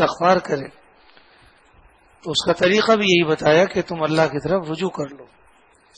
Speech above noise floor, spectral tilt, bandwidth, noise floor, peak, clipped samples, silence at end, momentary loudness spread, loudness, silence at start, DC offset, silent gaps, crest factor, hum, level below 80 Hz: 36 dB; -5 dB/octave; 10 kHz; -55 dBFS; -2 dBFS; under 0.1%; 0.75 s; 12 LU; -19 LUFS; 0 s; under 0.1%; none; 20 dB; none; -54 dBFS